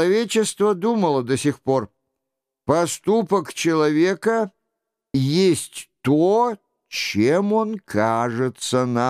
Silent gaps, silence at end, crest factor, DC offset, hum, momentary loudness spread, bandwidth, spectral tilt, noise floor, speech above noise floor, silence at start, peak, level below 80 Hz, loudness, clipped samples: none; 0 s; 16 dB; under 0.1%; none; 8 LU; 15.5 kHz; -5 dB/octave; -82 dBFS; 63 dB; 0 s; -4 dBFS; -62 dBFS; -21 LUFS; under 0.1%